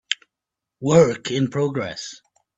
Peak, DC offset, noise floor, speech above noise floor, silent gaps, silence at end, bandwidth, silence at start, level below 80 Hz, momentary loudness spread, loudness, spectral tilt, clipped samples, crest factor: -2 dBFS; under 0.1%; -85 dBFS; 66 dB; none; 0.4 s; 8.2 kHz; 0.1 s; -58 dBFS; 15 LU; -21 LUFS; -5.5 dB/octave; under 0.1%; 20 dB